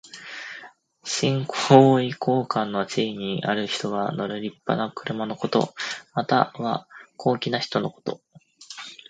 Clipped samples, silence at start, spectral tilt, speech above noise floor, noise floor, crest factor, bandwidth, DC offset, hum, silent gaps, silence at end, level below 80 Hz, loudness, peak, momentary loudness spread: under 0.1%; 0.05 s; -5.5 dB/octave; 24 dB; -47 dBFS; 24 dB; 9.4 kHz; under 0.1%; none; none; 0.15 s; -68 dBFS; -24 LUFS; 0 dBFS; 17 LU